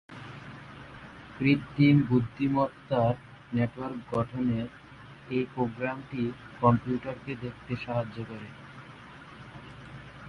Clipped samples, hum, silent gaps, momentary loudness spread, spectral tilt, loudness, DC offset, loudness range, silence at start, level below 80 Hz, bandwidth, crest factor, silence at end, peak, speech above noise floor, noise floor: under 0.1%; none; none; 22 LU; -9 dB/octave; -29 LUFS; under 0.1%; 5 LU; 0.1 s; -56 dBFS; 9.6 kHz; 20 dB; 0 s; -10 dBFS; 20 dB; -48 dBFS